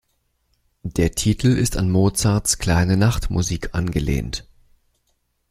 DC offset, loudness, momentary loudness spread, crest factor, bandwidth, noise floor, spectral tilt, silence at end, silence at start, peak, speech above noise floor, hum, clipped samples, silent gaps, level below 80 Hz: under 0.1%; -20 LUFS; 8 LU; 18 dB; 15.5 kHz; -68 dBFS; -5 dB/octave; 1.1 s; 0.85 s; -2 dBFS; 50 dB; none; under 0.1%; none; -32 dBFS